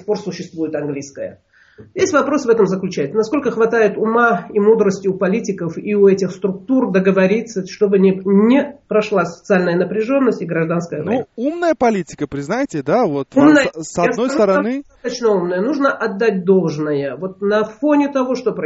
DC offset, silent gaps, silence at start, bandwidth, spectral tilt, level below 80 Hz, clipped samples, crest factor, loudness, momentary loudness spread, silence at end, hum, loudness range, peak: under 0.1%; none; 0.05 s; 8 kHz; -6 dB/octave; -56 dBFS; under 0.1%; 16 dB; -16 LUFS; 10 LU; 0 s; none; 3 LU; 0 dBFS